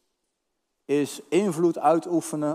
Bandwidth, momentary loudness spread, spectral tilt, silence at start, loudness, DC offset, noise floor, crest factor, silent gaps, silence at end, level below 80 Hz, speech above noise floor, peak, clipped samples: 15.5 kHz; 5 LU; -6 dB/octave; 0.9 s; -24 LUFS; under 0.1%; -78 dBFS; 18 dB; none; 0 s; -82 dBFS; 55 dB; -6 dBFS; under 0.1%